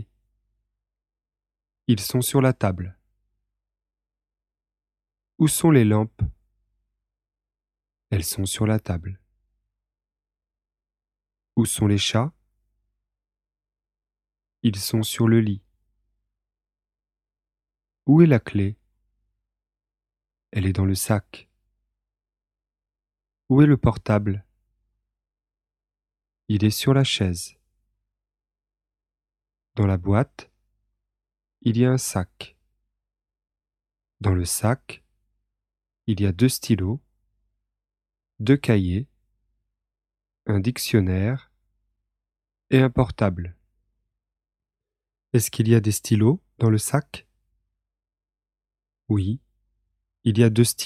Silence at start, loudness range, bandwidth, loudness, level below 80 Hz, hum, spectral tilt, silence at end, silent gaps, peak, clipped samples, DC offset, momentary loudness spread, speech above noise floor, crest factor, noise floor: 0 s; 5 LU; 15 kHz; -22 LUFS; -50 dBFS; none; -6 dB/octave; 0 s; none; -4 dBFS; under 0.1%; under 0.1%; 15 LU; over 70 dB; 22 dB; under -90 dBFS